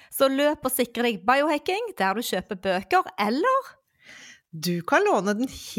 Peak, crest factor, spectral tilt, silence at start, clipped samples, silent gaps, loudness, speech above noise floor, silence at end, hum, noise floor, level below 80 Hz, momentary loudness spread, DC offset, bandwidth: -6 dBFS; 18 dB; -4 dB/octave; 0.1 s; under 0.1%; none; -24 LUFS; 25 dB; 0 s; none; -49 dBFS; -60 dBFS; 7 LU; under 0.1%; 17 kHz